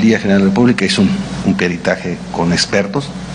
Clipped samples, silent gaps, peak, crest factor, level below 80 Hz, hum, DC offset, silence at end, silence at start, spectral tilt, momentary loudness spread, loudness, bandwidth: under 0.1%; none; 0 dBFS; 14 dB; -40 dBFS; none; 0.2%; 0 s; 0 s; -5.5 dB/octave; 8 LU; -14 LUFS; 10.5 kHz